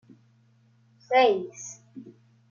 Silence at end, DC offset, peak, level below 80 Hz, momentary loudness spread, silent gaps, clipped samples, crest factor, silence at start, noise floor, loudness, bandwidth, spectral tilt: 0.4 s; under 0.1%; -8 dBFS; -84 dBFS; 26 LU; none; under 0.1%; 20 dB; 1.1 s; -62 dBFS; -24 LUFS; 7.4 kHz; -3 dB/octave